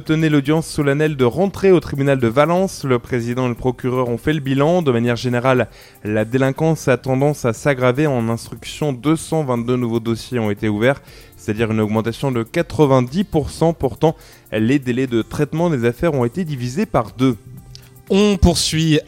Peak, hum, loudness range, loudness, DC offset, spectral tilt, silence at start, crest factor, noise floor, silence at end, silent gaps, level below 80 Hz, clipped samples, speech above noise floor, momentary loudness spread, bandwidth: 0 dBFS; none; 3 LU; -18 LUFS; under 0.1%; -6 dB/octave; 0 s; 18 dB; -40 dBFS; 0.05 s; none; -36 dBFS; under 0.1%; 23 dB; 7 LU; 17 kHz